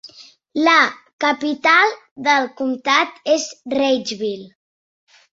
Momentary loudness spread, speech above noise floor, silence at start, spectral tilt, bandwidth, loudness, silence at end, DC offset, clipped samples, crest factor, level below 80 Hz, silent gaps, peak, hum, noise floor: 11 LU; 27 dB; 0.05 s; -2 dB/octave; 8 kHz; -18 LUFS; 0.9 s; under 0.1%; under 0.1%; 18 dB; -68 dBFS; 1.13-1.19 s, 2.11-2.16 s; 0 dBFS; none; -45 dBFS